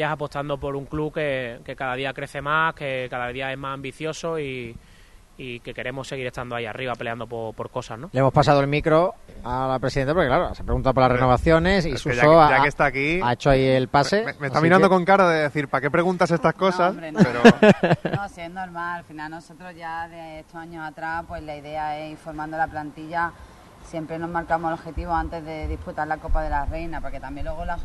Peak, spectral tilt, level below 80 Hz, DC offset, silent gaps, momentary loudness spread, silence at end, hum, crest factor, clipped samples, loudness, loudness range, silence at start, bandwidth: 0 dBFS; -6.5 dB/octave; -38 dBFS; under 0.1%; none; 17 LU; 0 s; none; 22 dB; under 0.1%; -22 LUFS; 13 LU; 0 s; 12 kHz